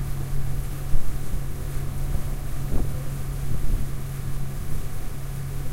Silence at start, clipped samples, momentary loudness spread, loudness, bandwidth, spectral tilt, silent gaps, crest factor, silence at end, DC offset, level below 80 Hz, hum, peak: 0 s; under 0.1%; 4 LU; -32 LUFS; 16 kHz; -6 dB/octave; none; 16 dB; 0 s; under 0.1%; -28 dBFS; none; -6 dBFS